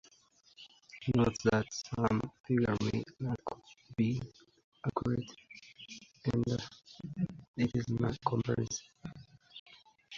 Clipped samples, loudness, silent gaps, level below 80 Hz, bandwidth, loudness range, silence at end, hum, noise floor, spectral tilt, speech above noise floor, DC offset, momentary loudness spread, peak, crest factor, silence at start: under 0.1%; -35 LUFS; 2.40-2.44 s, 4.64-4.72 s, 7.48-7.54 s, 9.59-9.66 s; -58 dBFS; 7.8 kHz; 5 LU; 0 s; none; -66 dBFS; -6 dB/octave; 33 dB; under 0.1%; 21 LU; -14 dBFS; 20 dB; 0.6 s